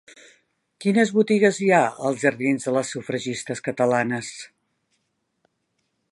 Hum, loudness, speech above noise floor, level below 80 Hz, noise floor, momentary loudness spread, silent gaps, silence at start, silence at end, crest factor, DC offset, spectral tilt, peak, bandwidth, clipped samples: none; -22 LUFS; 52 dB; -70 dBFS; -74 dBFS; 11 LU; none; 0.8 s; 1.65 s; 20 dB; under 0.1%; -5 dB/octave; -4 dBFS; 11.5 kHz; under 0.1%